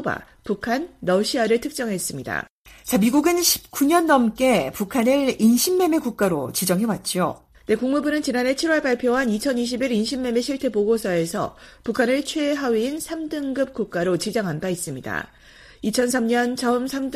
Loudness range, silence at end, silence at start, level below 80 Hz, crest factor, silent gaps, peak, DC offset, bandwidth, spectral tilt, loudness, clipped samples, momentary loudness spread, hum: 5 LU; 0 s; 0 s; -52 dBFS; 18 dB; 2.50-2.65 s; -4 dBFS; under 0.1%; 15.5 kHz; -4 dB/octave; -22 LUFS; under 0.1%; 10 LU; none